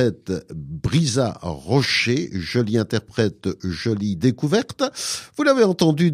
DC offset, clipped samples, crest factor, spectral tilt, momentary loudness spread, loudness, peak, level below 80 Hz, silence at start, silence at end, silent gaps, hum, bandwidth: under 0.1%; under 0.1%; 18 dB; -5.5 dB/octave; 11 LU; -21 LUFS; -4 dBFS; -48 dBFS; 0 s; 0 s; none; none; 15.5 kHz